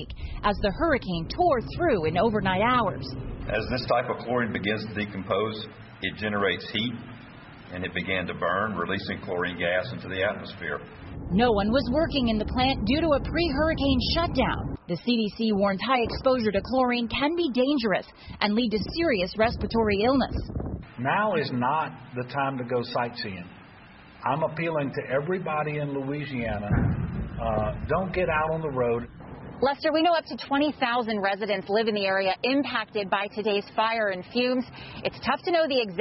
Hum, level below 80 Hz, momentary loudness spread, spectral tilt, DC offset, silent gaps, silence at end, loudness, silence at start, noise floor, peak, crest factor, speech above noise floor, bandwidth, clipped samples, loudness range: none; -42 dBFS; 10 LU; -9 dB/octave; under 0.1%; none; 0 s; -26 LUFS; 0 s; -49 dBFS; -6 dBFS; 20 dB; 23 dB; 6 kHz; under 0.1%; 5 LU